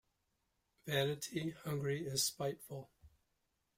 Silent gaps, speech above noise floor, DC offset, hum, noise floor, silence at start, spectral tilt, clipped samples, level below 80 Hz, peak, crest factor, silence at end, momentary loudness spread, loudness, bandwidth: none; 44 dB; under 0.1%; none; -83 dBFS; 0.85 s; -3.5 dB/octave; under 0.1%; -72 dBFS; -22 dBFS; 20 dB; 0.7 s; 15 LU; -39 LUFS; 16 kHz